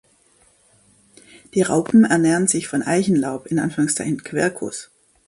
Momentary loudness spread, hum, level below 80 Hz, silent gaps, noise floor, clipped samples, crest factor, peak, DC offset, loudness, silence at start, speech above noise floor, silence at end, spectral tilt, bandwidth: 10 LU; none; -60 dBFS; none; -57 dBFS; under 0.1%; 18 dB; -4 dBFS; under 0.1%; -19 LUFS; 1.55 s; 39 dB; 0.45 s; -5 dB/octave; 11.5 kHz